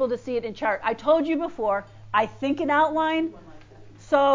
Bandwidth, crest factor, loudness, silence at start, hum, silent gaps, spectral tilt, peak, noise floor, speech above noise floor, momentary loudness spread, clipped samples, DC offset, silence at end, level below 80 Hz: 7.6 kHz; 16 dB; -24 LUFS; 0 s; none; none; -5.5 dB/octave; -8 dBFS; -46 dBFS; 22 dB; 7 LU; under 0.1%; under 0.1%; 0 s; -56 dBFS